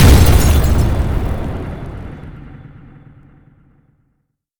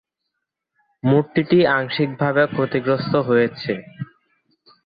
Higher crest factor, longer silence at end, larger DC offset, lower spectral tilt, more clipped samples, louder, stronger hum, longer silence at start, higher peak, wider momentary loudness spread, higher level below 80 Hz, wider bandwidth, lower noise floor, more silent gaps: about the same, 14 dB vs 16 dB; first, 1.7 s vs 0.8 s; neither; second, -6 dB/octave vs -9.5 dB/octave; first, 0.2% vs under 0.1%; first, -14 LUFS vs -19 LUFS; neither; second, 0 s vs 1.05 s; first, 0 dBFS vs -4 dBFS; first, 25 LU vs 12 LU; first, -18 dBFS vs -58 dBFS; first, over 20 kHz vs 5.2 kHz; second, -67 dBFS vs -79 dBFS; neither